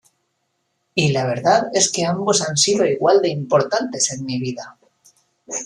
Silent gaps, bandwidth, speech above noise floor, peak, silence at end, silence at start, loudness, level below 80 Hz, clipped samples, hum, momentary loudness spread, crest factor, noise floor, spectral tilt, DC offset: none; 12 kHz; 53 dB; -2 dBFS; 0 s; 0.95 s; -18 LUFS; -62 dBFS; under 0.1%; none; 10 LU; 18 dB; -71 dBFS; -3.5 dB/octave; under 0.1%